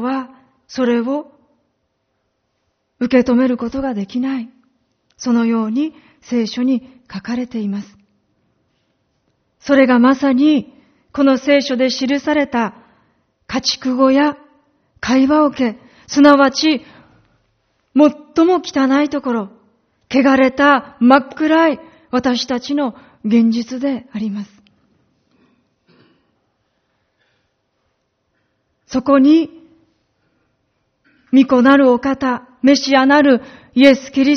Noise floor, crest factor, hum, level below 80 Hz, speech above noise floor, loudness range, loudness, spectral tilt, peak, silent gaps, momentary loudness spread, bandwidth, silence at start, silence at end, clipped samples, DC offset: -68 dBFS; 16 dB; none; -54 dBFS; 55 dB; 7 LU; -15 LUFS; -3 dB/octave; 0 dBFS; none; 13 LU; 6.6 kHz; 0 s; 0 s; under 0.1%; under 0.1%